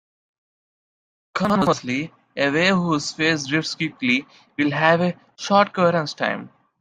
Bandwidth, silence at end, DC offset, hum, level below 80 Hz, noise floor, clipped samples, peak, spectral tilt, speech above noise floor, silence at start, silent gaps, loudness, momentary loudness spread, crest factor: 11.5 kHz; 0.35 s; under 0.1%; none; -60 dBFS; under -90 dBFS; under 0.1%; -2 dBFS; -5 dB/octave; over 69 dB; 1.35 s; none; -21 LUFS; 9 LU; 20 dB